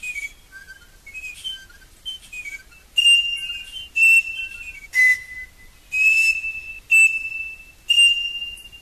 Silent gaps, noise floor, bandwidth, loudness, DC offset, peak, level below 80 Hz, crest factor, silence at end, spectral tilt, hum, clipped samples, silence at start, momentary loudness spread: none; -45 dBFS; 14 kHz; -16 LUFS; under 0.1%; -10 dBFS; -52 dBFS; 12 dB; 0.05 s; 3 dB/octave; none; under 0.1%; 0 s; 21 LU